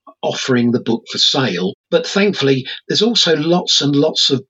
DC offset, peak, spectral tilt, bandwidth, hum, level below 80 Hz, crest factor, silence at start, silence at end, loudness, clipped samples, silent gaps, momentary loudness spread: under 0.1%; -2 dBFS; -4 dB/octave; 8.2 kHz; none; -74 dBFS; 14 dB; 0.05 s; 0.1 s; -15 LUFS; under 0.1%; 1.74-1.84 s; 7 LU